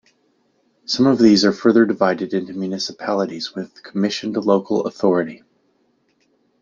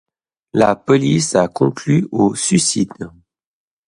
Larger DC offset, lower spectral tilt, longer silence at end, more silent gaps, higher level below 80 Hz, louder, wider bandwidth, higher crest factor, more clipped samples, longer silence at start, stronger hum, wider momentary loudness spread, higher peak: neither; about the same, -5.5 dB/octave vs -5 dB/octave; first, 1.25 s vs 0.8 s; neither; second, -62 dBFS vs -52 dBFS; about the same, -18 LUFS vs -16 LUFS; second, 7.6 kHz vs 11.5 kHz; about the same, 18 dB vs 16 dB; neither; first, 0.9 s vs 0.55 s; neither; first, 14 LU vs 9 LU; about the same, -2 dBFS vs 0 dBFS